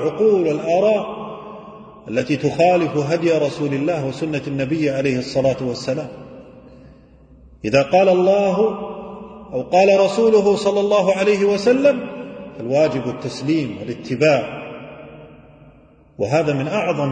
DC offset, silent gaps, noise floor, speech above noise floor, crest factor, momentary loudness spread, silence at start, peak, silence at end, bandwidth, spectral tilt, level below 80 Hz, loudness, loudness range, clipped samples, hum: under 0.1%; none; -49 dBFS; 31 dB; 16 dB; 19 LU; 0 s; -2 dBFS; 0 s; 9.2 kHz; -6 dB/octave; -54 dBFS; -18 LUFS; 6 LU; under 0.1%; none